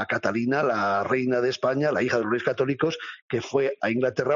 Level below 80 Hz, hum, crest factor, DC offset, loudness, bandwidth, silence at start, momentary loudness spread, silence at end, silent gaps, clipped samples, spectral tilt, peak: -66 dBFS; none; 14 dB; under 0.1%; -25 LUFS; 7.4 kHz; 0 s; 4 LU; 0 s; 3.22-3.29 s; under 0.1%; -4.5 dB/octave; -10 dBFS